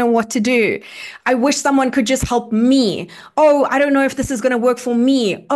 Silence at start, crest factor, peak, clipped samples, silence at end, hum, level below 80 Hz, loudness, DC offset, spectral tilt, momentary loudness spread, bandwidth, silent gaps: 0 s; 12 dB; -4 dBFS; under 0.1%; 0 s; none; -42 dBFS; -16 LUFS; under 0.1%; -4.5 dB/octave; 6 LU; 12.5 kHz; none